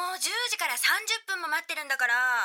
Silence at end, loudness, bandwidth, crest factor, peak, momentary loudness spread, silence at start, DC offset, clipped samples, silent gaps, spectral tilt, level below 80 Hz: 0 s; -26 LUFS; 19 kHz; 16 dB; -12 dBFS; 6 LU; 0 s; under 0.1%; under 0.1%; none; 4 dB/octave; under -90 dBFS